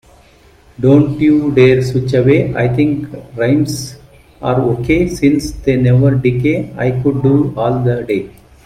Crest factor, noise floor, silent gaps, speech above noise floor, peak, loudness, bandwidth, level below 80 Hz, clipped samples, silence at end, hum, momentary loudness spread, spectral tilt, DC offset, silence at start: 14 dB; -45 dBFS; none; 33 dB; 0 dBFS; -13 LUFS; 14 kHz; -36 dBFS; under 0.1%; 0.35 s; none; 9 LU; -7.5 dB/octave; under 0.1%; 0.8 s